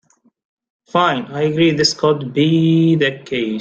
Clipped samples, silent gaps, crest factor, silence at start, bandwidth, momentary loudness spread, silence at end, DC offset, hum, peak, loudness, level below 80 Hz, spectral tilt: under 0.1%; none; 14 dB; 0.95 s; 8.8 kHz; 7 LU; 0 s; under 0.1%; none; -2 dBFS; -16 LUFS; -56 dBFS; -5.5 dB/octave